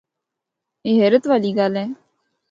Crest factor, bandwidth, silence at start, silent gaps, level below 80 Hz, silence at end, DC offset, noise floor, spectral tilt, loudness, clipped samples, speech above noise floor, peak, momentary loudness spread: 18 dB; 7.6 kHz; 0.85 s; none; -70 dBFS; 0.55 s; under 0.1%; -82 dBFS; -7.5 dB/octave; -18 LUFS; under 0.1%; 65 dB; -2 dBFS; 15 LU